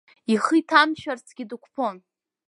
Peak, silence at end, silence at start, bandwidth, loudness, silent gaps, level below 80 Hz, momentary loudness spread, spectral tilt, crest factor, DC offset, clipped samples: -2 dBFS; 0.5 s; 0.3 s; 11.5 kHz; -22 LUFS; none; -72 dBFS; 17 LU; -4 dB/octave; 22 dB; under 0.1%; under 0.1%